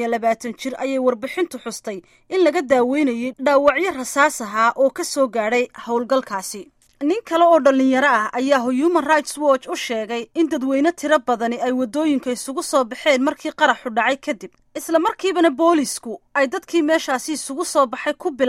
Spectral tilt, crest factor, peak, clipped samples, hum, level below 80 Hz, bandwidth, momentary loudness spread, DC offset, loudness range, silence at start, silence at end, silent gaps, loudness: -3 dB/octave; 18 dB; -2 dBFS; under 0.1%; none; -62 dBFS; 16 kHz; 10 LU; under 0.1%; 3 LU; 0 s; 0 s; none; -19 LUFS